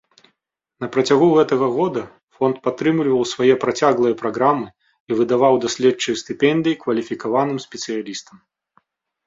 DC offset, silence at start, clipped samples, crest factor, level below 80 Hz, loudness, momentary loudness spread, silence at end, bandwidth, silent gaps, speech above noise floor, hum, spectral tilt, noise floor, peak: under 0.1%; 0.8 s; under 0.1%; 18 dB; -62 dBFS; -19 LUFS; 11 LU; 1.05 s; 7.8 kHz; 2.23-2.27 s, 5.00-5.07 s; 57 dB; none; -5 dB/octave; -75 dBFS; -2 dBFS